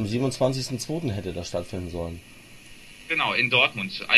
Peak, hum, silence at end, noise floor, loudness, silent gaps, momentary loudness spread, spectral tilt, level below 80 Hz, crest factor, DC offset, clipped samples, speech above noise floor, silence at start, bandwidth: -2 dBFS; none; 0 s; -46 dBFS; -25 LUFS; none; 16 LU; -4 dB/octave; -48 dBFS; 24 dB; under 0.1%; under 0.1%; 21 dB; 0 s; 15 kHz